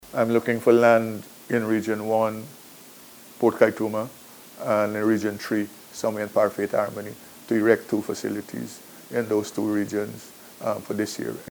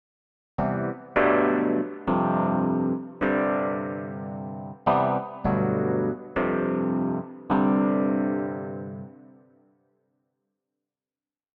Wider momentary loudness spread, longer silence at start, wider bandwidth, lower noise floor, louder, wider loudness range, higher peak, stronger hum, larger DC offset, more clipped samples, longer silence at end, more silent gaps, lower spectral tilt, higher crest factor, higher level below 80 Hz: first, 22 LU vs 13 LU; second, 0.05 s vs 0.6 s; first, over 20 kHz vs 4.5 kHz; second, -47 dBFS vs under -90 dBFS; about the same, -24 LUFS vs -26 LUFS; about the same, 4 LU vs 5 LU; first, -2 dBFS vs -8 dBFS; second, none vs 50 Hz at -60 dBFS; neither; neither; second, 0 s vs 2.4 s; neither; second, -5.5 dB/octave vs -11 dB/octave; about the same, 22 dB vs 18 dB; second, -68 dBFS vs -54 dBFS